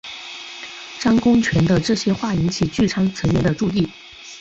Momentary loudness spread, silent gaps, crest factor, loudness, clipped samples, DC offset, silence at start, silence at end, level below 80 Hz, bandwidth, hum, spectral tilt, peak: 16 LU; none; 14 dB; -19 LUFS; under 0.1%; under 0.1%; 0.05 s; 0 s; -40 dBFS; 8 kHz; none; -6 dB/octave; -4 dBFS